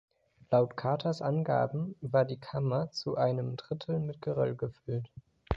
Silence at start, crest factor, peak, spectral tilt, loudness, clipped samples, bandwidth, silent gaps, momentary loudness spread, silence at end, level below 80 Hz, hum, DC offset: 0.5 s; 22 dB; -10 dBFS; -8 dB/octave; -32 LUFS; under 0.1%; 7.8 kHz; none; 9 LU; 0 s; -56 dBFS; none; under 0.1%